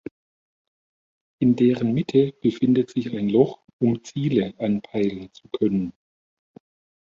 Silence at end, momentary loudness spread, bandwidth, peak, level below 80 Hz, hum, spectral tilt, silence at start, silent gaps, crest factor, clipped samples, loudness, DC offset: 1.1 s; 7 LU; 7.4 kHz; -4 dBFS; -60 dBFS; none; -8 dB/octave; 1.4 s; 3.73-3.79 s; 20 dB; under 0.1%; -22 LUFS; under 0.1%